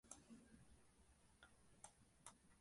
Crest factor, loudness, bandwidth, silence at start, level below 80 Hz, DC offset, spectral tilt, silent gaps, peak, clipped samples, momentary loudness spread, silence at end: 30 dB; -65 LUFS; 11.5 kHz; 0.05 s; -78 dBFS; under 0.1%; -3 dB/octave; none; -38 dBFS; under 0.1%; 4 LU; 0 s